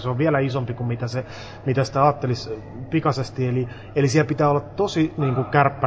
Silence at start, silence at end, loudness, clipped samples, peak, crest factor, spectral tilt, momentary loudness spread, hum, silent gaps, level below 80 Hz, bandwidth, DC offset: 0 s; 0 s; -22 LUFS; under 0.1%; -2 dBFS; 20 dB; -7 dB/octave; 9 LU; none; none; -48 dBFS; 8 kHz; under 0.1%